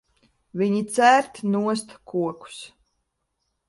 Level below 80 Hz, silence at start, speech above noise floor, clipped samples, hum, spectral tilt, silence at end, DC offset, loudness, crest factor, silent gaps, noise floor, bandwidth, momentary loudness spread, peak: -68 dBFS; 0.55 s; 54 dB; under 0.1%; none; -5 dB/octave; 1 s; under 0.1%; -22 LUFS; 22 dB; none; -76 dBFS; 11.5 kHz; 21 LU; -4 dBFS